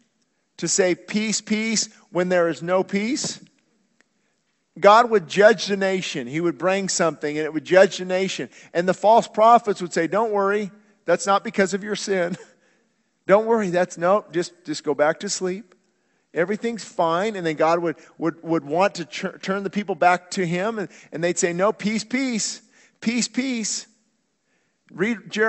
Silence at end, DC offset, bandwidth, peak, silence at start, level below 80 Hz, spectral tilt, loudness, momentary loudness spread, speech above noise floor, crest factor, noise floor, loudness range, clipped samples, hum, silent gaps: 0 s; under 0.1%; 8.6 kHz; 0 dBFS; 0.6 s; -70 dBFS; -4 dB/octave; -21 LUFS; 12 LU; 49 dB; 22 dB; -70 dBFS; 5 LU; under 0.1%; none; none